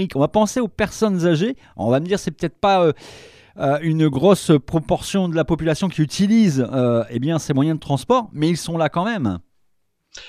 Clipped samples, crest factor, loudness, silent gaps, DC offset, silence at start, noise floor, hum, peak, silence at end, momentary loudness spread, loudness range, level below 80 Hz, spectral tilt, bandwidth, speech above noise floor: under 0.1%; 18 dB; -19 LUFS; none; under 0.1%; 0 s; -69 dBFS; none; 0 dBFS; 0 s; 7 LU; 2 LU; -46 dBFS; -6.5 dB/octave; 14.5 kHz; 50 dB